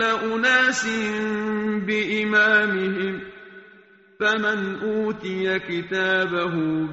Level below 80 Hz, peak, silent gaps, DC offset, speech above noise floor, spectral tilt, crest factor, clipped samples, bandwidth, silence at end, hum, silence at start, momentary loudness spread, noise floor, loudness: -60 dBFS; -6 dBFS; none; under 0.1%; 29 dB; -2.5 dB/octave; 16 dB; under 0.1%; 8 kHz; 0 s; none; 0 s; 9 LU; -52 dBFS; -22 LUFS